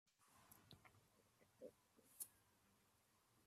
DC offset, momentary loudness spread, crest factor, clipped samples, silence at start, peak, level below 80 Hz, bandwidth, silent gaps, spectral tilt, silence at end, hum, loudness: under 0.1%; 12 LU; 30 dB; under 0.1%; 0.05 s; -36 dBFS; under -90 dBFS; 15.5 kHz; none; -2.5 dB/octave; 0 s; none; -61 LUFS